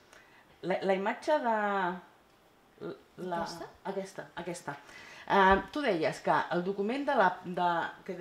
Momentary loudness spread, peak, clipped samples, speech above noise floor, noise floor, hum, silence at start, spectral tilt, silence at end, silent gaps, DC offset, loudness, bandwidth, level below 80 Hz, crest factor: 18 LU; -10 dBFS; under 0.1%; 32 dB; -63 dBFS; none; 0.65 s; -5.5 dB/octave; 0 s; none; under 0.1%; -31 LUFS; 15 kHz; -58 dBFS; 22 dB